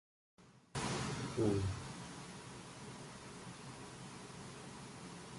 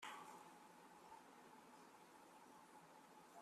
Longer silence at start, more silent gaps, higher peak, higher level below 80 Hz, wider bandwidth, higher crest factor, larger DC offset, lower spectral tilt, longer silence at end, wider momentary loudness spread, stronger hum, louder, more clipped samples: first, 0.4 s vs 0 s; neither; first, -22 dBFS vs -42 dBFS; first, -60 dBFS vs under -90 dBFS; second, 11.5 kHz vs 13.5 kHz; about the same, 22 dB vs 22 dB; neither; first, -5 dB/octave vs -2.5 dB/octave; about the same, 0 s vs 0 s; first, 14 LU vs 6 LU; neither; first, -44 LUFS vs -63 LUFS; neither